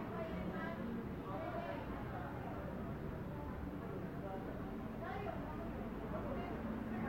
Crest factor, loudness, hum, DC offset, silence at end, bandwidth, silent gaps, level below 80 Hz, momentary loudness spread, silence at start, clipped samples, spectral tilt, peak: 14 dB; -45 LUFS; none; under 0.1%; 0 s; 16.5 kHz; none; -54 dBFS; 3 LU; 0 s; under 0.1%; -8.5 dB/octave; -30 dBFS